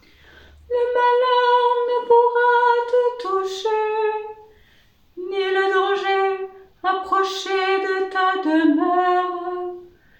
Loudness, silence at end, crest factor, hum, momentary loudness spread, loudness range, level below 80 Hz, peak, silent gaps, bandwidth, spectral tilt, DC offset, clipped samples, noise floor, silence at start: -20 LUFS; 0.35 s; 14 dB; none; 12 LU; 5 LU; -62 dBFS; -6 dBFS; none; 8.8 kHz; -3 dB/octave; under 0.1%; under 0.1%; -56 dBFS; 0.7 s